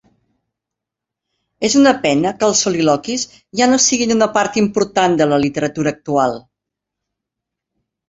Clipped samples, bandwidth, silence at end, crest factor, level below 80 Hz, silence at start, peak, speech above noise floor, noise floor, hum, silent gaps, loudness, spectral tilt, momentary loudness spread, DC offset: under 0.1%; 8 kHz; 1.7 s; 16 dB; -54 dBFS; 1.6 s; -2 dBFS; 68 dB; -83 dBFS; none; none; -15 LUFS; -3.5 dB/octave; 9 LU; under 0.1%